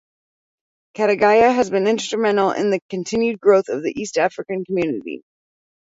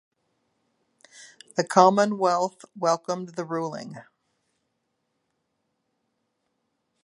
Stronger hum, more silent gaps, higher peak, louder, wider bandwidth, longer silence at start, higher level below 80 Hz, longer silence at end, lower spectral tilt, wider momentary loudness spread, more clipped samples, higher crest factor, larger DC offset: neither; first, 2.82-2.89 s vs none; about the same, -2 dBFS vs -2 dBFS; first, -19 LUFS vs -24 LUFS; second, 8 kHz vs 11.5 kHz; second, 1 s vs 1.2 s; first, -60 dBFS vs -80 dBFS; second, 0.65 s vs 3 s; about the same, -5 dB/octave vs -5 dB/octave; second, 11 LU vs 14 LU; neither; second, 18 dB vs 26 dB; neither